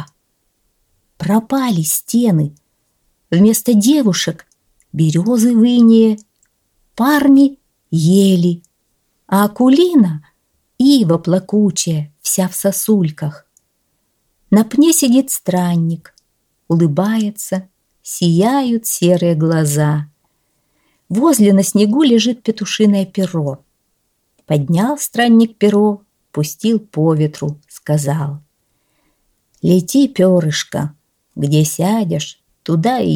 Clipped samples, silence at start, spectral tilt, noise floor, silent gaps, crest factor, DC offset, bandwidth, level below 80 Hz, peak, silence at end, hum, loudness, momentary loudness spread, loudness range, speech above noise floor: under 0.1%; 0 s; -5.5 dB/octave; -65 dBFS; none; 14 dB; under 0.1%; 18.5 kHz; -58 dBFS; -2 dBFS; 0 s; none; -14 LUFS; 13 LU; 4 LU; 52 dB